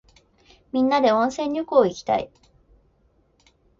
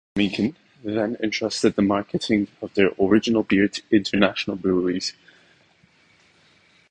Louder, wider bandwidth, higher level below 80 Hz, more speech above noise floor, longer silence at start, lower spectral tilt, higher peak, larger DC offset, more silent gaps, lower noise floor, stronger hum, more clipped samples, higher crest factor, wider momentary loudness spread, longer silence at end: about the same, -22 LUFS vs -22 LUFS; second, 7.6 kHz vs 10 kHz; about the same, -58 dBFS vs -54 dBFS; first, 42 dB vs 37 dB; first, 0.75 s vs 0.15 s; about the same, -5 dB/octave vs -5.5 dB/octave; about the same, -4 dBFS vs -2 dBFS; neither; neither; first, -62 dBFS vs -58 dBFS; neither; neither; about the same, 20 dB vs 20 dB; about the same, 9 LU vs 8 LU; second, 1.55 s vs 1.8 s